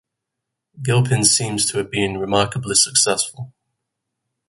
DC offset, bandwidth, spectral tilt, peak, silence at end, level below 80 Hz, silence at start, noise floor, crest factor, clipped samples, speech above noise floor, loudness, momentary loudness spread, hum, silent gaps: under 0.1%; 12 kHz; -3 dB/octave; 0 dBFS; 1 s; -52 dBFS; 0.75 s; -81 dBFS; 20 dB; under 0.1%; 62 dB; -17 LUFS; 11 LU; none; none